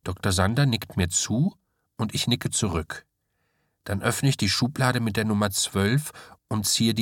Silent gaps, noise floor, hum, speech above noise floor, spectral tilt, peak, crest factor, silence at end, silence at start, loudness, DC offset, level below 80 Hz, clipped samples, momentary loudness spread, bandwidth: none; -74 dBFS; none; 50 dB; -4 dB/octave; -6 dBFS; 20 dB; 0 s; 0.05 s; -24 LUFS; under 0.1%; -50 dBFS; under 0.1%; 10 LU; 17.5 kHz